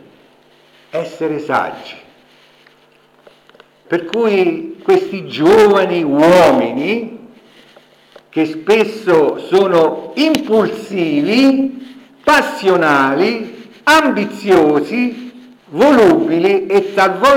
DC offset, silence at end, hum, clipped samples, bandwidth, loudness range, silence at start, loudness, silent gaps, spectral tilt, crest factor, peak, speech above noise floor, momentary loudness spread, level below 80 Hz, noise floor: under 0.1%; 0 s; none; under 0.1%; 17 kHz; 9 LU; 0.95 s; -13 LUFS; none; -5.5 dB/octave; 12 dB; -2 dBFS; 38 dB; 14 LU; -52 dBFS; -50 dBFS